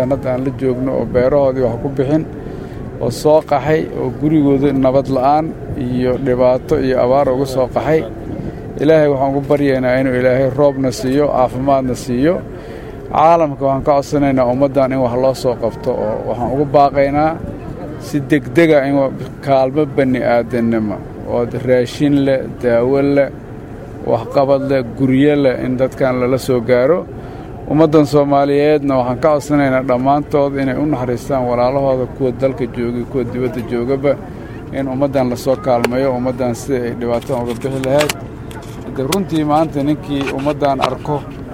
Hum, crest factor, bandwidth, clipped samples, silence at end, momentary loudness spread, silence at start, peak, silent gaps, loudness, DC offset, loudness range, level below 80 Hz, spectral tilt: none; 14 dB; 16.5 kHz; under 0.1%; 0 s; 10 LU; 0 s; 0 dBFS; none; -15 LUFS; under 0.1%; 4 LU; -36 dBFS; -7 dB/octave